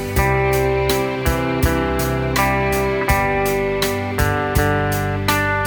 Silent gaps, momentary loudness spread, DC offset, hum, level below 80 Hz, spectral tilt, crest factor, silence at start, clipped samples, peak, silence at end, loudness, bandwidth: none; 3 LU; under 0.1%; none; -28 dBFS; -5 dB/octave; 18 dB; 0 s; under 0.1%; 0 dBFS; 0 s; -18 LUFS; over 20 kHz